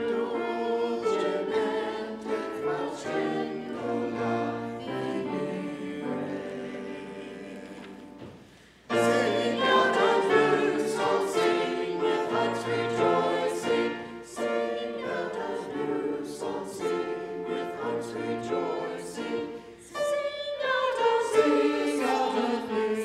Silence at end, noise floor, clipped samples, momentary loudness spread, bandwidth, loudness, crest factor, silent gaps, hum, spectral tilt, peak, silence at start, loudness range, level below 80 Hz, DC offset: 0 s; -53 dBFS; under 0.1%; 13 LU; 13.5 kHz; -28 LUFS; 20 dB; none; none; -4.5 dB/octave; -8 dBFS; 0 s; 8 LU; -68 dBFS; under 0.1%